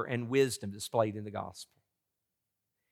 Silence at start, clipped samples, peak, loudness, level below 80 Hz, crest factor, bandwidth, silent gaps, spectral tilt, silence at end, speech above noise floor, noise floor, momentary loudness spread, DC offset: 0 s; under 0.1%; -14 dBFS; -33 LUFS; -80 dBFS; 22 dB; 16 kHz; none; -5 dB/octave; 1.3 s; 53 dB; -86 dBFS; 17 LU; under 0.1%